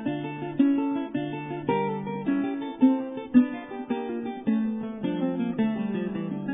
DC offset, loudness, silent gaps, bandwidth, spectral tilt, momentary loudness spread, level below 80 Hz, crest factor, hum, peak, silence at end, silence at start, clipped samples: under 0.1%; -27 LUFS; none; 3.8 kHz; -11 dB/octave; 9 LU; -64 dBFS; 20 dB; none; -6 dBFS; 0 s; 0 s; under 0.1%